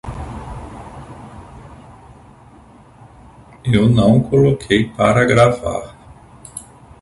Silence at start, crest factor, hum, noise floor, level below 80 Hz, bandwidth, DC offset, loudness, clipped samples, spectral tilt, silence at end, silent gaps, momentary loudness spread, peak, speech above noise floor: 0.05 s; 18 dB; none; -44 dBFS; -38 dBFS; 11.5 kHz; under 0.1%; -15 LUFS; under 0.1%; -6.5 dB/octave; 0.4 s; none; 24 LU; 0 dBFS; 31 dB